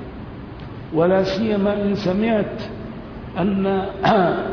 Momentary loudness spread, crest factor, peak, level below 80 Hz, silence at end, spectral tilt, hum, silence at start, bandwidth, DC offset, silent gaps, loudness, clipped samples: 17 LU; 16 dB; -6 dBFS; -42 dBFS; 0 s; -7.5 dB/octave; none; 0 s; 5.4 kHz; under 0.1%; none; -20 LUFS; under 0.1%